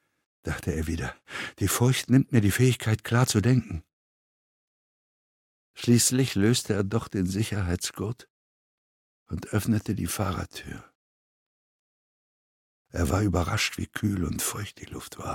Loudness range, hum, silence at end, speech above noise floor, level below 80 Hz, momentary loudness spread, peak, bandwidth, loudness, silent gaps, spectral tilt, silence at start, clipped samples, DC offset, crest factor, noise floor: 8 LU; none; 0 s; over 64 dB; -46 dBFS; 16 LU; -6 dBFS; 17.5 kHz; -26 LUFS; 3.93-5.74 s, 8.30-9.26 s, 10.95-12.85 s; -5 dB/octave; 0.45 s; under 0.1%; under 0.1%; 20 dB; under -90 dBFS